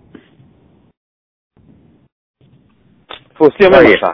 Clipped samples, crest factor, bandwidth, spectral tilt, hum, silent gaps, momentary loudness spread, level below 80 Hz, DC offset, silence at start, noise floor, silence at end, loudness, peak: 0.9%; 14 dB; 5.4 kHz; -7.5 dB/octave; none; none; 28 LU; -44 dBFS; under 0.1%; 3.4 s; -52 dBFS; 0 s; -8 LUFS; 0 dBFS